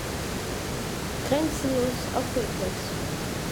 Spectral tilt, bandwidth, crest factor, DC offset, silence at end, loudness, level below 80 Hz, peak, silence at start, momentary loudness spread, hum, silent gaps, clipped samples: -4.5 dB/octave; over 20 kHz; 18 dB; under 0.1%; 0 s; -29 LUFS; -42 dBFS; -10 dBFS; 0 s; 5 LU; none; none; under 0.1%